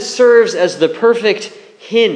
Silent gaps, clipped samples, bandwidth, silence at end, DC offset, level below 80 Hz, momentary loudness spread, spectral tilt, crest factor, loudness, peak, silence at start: none; under 0.1%; 10 kHz; 0 s; under 0.1%; -70 dBFS; 10 LU; -3.5 dB/octave; 12 dB; -12 LUFS; 0 dBFS; 0 s